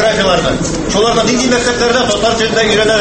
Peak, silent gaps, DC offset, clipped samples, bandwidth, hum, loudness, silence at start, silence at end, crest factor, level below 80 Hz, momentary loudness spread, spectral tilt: 0 dBFS; none; under 0.1%; under 0.1%; 8.8 kHz; none; -11 LUFS; 0 s; 0 s; 12 dB; -30 dBFS; 3 LU; -3.5 dB/octave